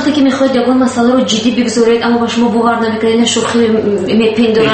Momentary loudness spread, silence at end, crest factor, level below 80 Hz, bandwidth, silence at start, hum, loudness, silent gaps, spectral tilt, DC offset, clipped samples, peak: 2 LU; 0 s; 10 dB; -46 dBFS; 8.8 kHz; 0 s; none; -11 LUFS; none; -4.5 dB/octave; under 0.1%; under 0.1%; 0 dBFS